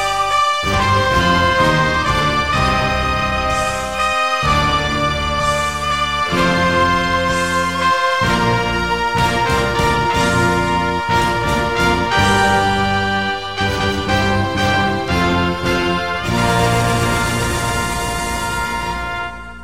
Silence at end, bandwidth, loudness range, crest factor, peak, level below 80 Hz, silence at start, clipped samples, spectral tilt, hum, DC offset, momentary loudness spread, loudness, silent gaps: 0 s; 16.5 kHz; 2 LU; 14 dB; -2 dBFS; -30 dBFS; 0 s; under 0.1%; -4.5 dB/octave; none; 1%; 5 LU; -16 LUFS; none